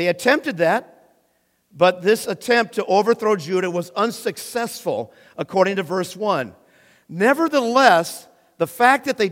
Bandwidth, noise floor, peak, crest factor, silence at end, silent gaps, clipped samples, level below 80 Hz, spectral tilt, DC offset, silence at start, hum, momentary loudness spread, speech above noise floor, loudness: 16.5 kHz; -65 dBFS; 0 dBFS; 20 dB; 0 s; none; under 0.1%; -70 dBFS; -4.5 dB/octave; under 0.1%; 0 s; none; 11 LU; 46 dB; -19 LUFS